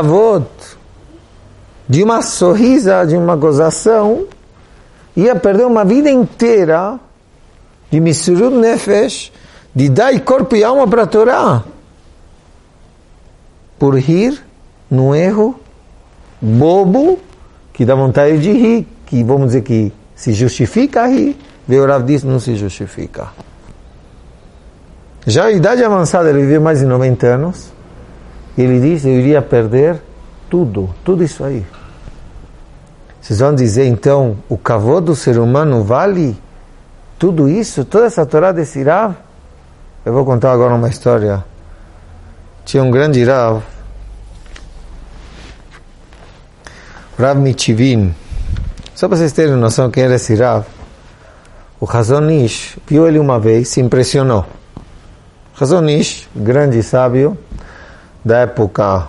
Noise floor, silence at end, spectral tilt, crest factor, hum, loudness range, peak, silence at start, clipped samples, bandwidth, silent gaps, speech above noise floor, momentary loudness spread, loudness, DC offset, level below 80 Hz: -44 dBFS; 0 s; -7 dB/octave; 12 dB; none; 5 LU; 0 dBFS; 0 s; under 0.1%; 11.5 kHz; none; 33 dB; 12 LU; -12 LUFS; under 0.1%; -36 dBFS